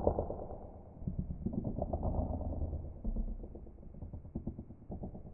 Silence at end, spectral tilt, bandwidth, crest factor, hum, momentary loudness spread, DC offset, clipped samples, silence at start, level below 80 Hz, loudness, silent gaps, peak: 0 s; -12 dB/octave; 1.7 kHz; 24 dB; none; 14 LU; under 0.1%; under 0.1%; 0 s; -44 dBFS; -42 LUFS; none; -14 dBFS